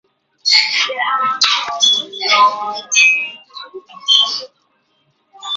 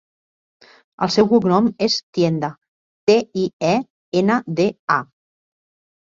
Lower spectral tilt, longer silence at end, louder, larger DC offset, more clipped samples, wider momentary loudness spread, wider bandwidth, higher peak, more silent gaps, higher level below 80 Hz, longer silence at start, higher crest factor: second, 2.5 dB/octave vs -5.5 dB/octave; second, 0 s vs 1.1 s; first, -13 LUFS vs -19 LUFS; neither; neither; first, 19 LU vs 8 LU; about the same, 7.8 kHz vs 7.6 kHz; about the same, 0 dBFS vs -2 dBFS; second, none vs 2.03-2.13 s, 2.68-3.07 s, 3.53-3.60 s, 3.90-4.12 s, 4.79-4.88 s; second, -68 dBFS vs -60 dBFS; second, 0.45 s vs 1 s; about the same, 16 dB vs 18 dB